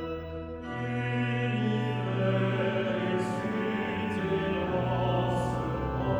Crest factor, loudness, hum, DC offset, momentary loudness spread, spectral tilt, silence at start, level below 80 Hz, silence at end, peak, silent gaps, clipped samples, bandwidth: 14 dB; -30 LUFS; none; under 0.1%; 6 LU; -7.5 dB/octave; 0 s; -48 dBFS; 0 s; -16 dBFS; none; under 0.1%; 11 kHz